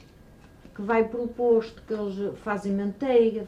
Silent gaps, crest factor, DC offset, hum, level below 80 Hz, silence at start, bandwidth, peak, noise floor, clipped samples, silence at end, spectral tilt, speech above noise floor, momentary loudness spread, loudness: none; 16 dB; under 0.1%; none; -56 dBFS; 0.65 s; 8.4 kHz; -10 dBFS; -51 dBFS; under 0.1%; 0 s; -7.5 dB/octave; 26 dB; 10 LU; -26 LUFS